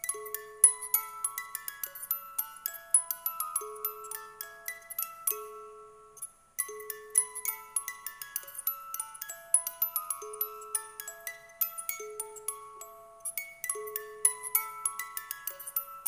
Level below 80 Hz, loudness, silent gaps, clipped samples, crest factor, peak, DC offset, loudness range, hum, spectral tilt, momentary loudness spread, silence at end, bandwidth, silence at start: -76 dBFS; -32 LUFS; none; under 0.1%; 28 dB; -6 dBFS; under 0.1%; 6 LU; none; 2 dB/octave; 15 LU; 0 s; 17.5 kHz; 0 s